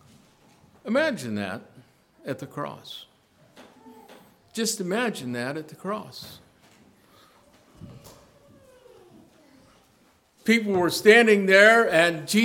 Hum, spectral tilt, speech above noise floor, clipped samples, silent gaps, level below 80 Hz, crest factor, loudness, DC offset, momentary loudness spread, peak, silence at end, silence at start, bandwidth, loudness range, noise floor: none; -4 dB/octave; 39 dB; under 0.1%; none; -68 dBFS; 24 dB; -21 LUFS; under 0.1%; 25 LU; -2 dBFS; 0 s; 0.85 s; 18 kHz; 20 LU; -61 dBFS